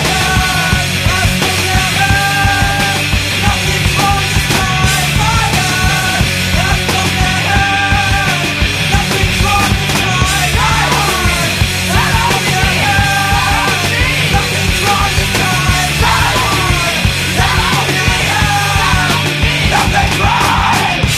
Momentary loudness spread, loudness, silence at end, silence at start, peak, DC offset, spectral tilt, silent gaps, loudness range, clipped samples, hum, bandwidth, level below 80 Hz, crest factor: 2 LU; -11 LUFS; 0 s; 0 s; 0 dBFS; under 0.1%; -3.5 dB/octave; none; 0 LU; under 0.1%; none; 15.5 kHz; -22 dBFS; 12 dB